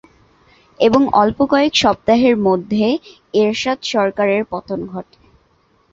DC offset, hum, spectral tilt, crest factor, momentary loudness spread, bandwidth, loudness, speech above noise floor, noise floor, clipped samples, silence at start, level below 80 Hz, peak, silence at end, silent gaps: under 0.1%; none; -5 dB/octave; 16 dB; 11 LU; 7.8 kHz; -16 LUFS; 42 dB; -57 dBFS; under 0.1%; 0.8 s; -48 dBFS; 0 dBFS; 0.9 s; none